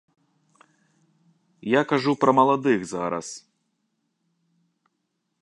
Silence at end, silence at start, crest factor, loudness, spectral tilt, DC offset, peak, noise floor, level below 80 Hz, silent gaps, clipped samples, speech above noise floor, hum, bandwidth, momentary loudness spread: 2.05 s; 1.65 s; 22 dB; -22 LUFS; -5.5 dB/octave; under 0.1%; -4 dBFS; -77 dBFS; -70 dBFS; none; under 0.1%; 55 dB; none; 11 kHz; 18 LU